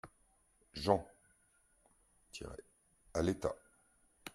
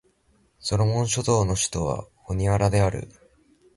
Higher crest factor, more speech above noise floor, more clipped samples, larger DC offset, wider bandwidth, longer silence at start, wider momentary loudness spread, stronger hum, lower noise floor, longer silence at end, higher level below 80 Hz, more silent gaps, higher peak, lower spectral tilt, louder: first, 28 dB vs 18 dB; second, 37 dB vs 41 dB; neither; neither; first, 16 kHz vs 11.5 kHz; second, 0.05 s vs 0.65 s; first, 21 LU vs 12 LU; neither; first, -73 dBFS vs -64 dBFS; second, 0.05 s vs 0.65 s; second, -62 dBFS vs -40 dBFS; neither; second, -14 dBFS vs -6 dBFS; about the same, -5.5 dB/octave vs -5 dB/octave; second, -38 LUFS vs -24 LUFS